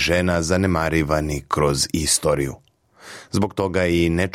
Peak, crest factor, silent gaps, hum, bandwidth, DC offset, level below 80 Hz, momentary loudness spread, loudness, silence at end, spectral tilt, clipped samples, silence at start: -4 dBFS; 16 dB; none; none; 16.5 kHz; under 0.1%; -40 dBFS; 7 LU; -20 LUFS; 0.05 s; -4.5 dB/octave; under 0.1%; 0 s